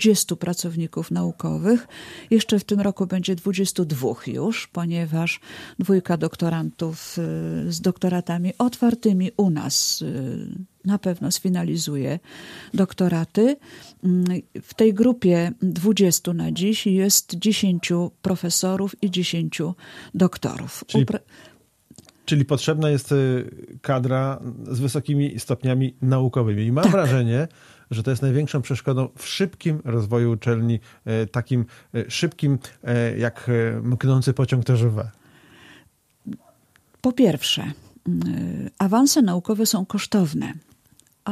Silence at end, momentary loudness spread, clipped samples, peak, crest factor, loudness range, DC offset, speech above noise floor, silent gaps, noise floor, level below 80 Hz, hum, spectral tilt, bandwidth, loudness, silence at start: 0 s; 11 LU; under 0.1%; -2 dBFS; 20 dB; 4 LU; under 0.1%; 38 dB; none; -59 dBFS; -58 dBFS; none; -5.5 dB/octave; 15.5 kHz; -22 LUFS; 0 s